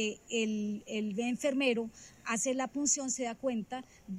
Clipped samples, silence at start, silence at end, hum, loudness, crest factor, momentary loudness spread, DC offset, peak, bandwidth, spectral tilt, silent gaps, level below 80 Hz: under 0.1%; 0 s; 0 s; none; -33 LUFS; 18 dB; 10 LU; under 0.1%; -16 dBFS; 16 kHz; -3 dB/octave; none; -70 dBFS